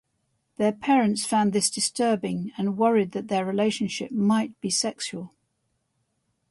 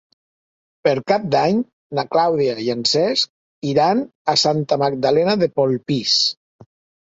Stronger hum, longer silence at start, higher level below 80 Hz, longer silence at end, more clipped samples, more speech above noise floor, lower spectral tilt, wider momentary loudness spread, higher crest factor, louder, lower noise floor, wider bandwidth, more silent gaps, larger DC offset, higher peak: neither; second, 0.6 s vs 0.85 s; second, -68 dBFS vs -60 dBFS; first, 1.25 s vs 0.7 s; neither; second, 50 dB vs over 72 dB; about the same, -4 dB/octave vs -4.5 dB/octave; about the same, 7 LU vs 6 LU; about the same, 16 dB vs 18 dB; second, -25 LUFS vs -18 LUFS; second, -75 dBFS vs under -90 dBFS; first, 11.5 kHz vs 8 kHz; second, none vs 1.73-1.90 s, 3.30-3.62 s, 4.15-4.25 s; neither; second, -8 dBFS vs -2 dBFS